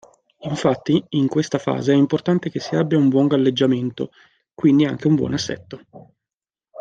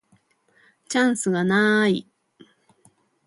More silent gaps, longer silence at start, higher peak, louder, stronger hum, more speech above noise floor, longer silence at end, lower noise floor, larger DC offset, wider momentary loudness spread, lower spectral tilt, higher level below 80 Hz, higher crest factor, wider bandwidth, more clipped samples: first, 6.34-6.38 s vs none; second, 0.4 s vs 0.9 s; first, -4 dBFS vs -8 dBFS; about the same, -19 LUFS vs -21 LUFS; neither; first, over 71 dB vs 43 dB; second, 0 s vs 1.25 s; first, under -90 dBFS vs -63 dBFS; neither; first, 14 LU vs 7 LU; first, -6.5 dB/octave vs -4.5 dB/octave; first, -60 dBFS vs -68 dBFS; about the same, 16 dB vs 18 dB; second, 7.8 kHz vs 11.5 kHz; neither